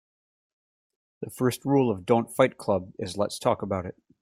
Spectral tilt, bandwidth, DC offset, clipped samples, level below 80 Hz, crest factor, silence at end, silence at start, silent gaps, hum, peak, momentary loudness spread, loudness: -6 dB/octave; 16 kHz; under 0.1%; under 0.1%; -66 dBFS; 22 dB; 0.3 s; 1.2 s; none; none; -6 dBFS; 12 LU; -26 LUFS